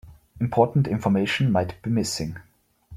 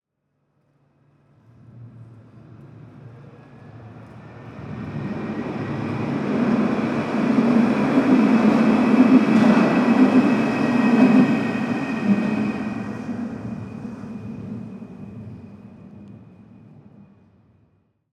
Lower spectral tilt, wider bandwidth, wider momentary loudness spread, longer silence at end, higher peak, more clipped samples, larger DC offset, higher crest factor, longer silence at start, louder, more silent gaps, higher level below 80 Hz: second, -6 dB/octave vs -7.5 dB/octave; first, 15.5 kHz vs 9.2 kHz; second, 9 LU vs 22 LU; second, 0 s vs 1.95 s; second, -6 dBFS vs -2 dBFS; neither; neither; about the same, 18 dB vs 18 dB; second, 0.05 s vs 1.75 s; second, -24 LUFS vs -19 LUFS; neither; first, -52 dBFS vs -58 dBFS